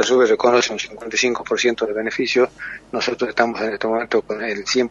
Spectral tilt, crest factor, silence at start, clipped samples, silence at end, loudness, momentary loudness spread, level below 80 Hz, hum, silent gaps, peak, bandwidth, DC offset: -2.5 dB/octave; 20 dB; 0 s; under 0.1%; 0 s; -19 LUFS; 8 LU; -56 dBFS; none; none; 0 dBFS; 7.6 kHz; under 0.1%